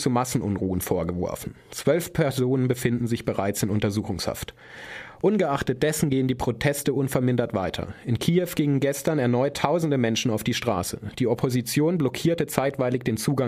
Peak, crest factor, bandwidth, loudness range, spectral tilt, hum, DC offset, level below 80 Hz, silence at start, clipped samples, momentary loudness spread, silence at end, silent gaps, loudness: -4 dBFS; 20 dB; 15.5 kHz; 2 LU; -5.5 dB/octave; none; under 0.1%; -50 dBFS; 0 s; under 0.1%; 7 LU; 0 s; none; -25 LUFS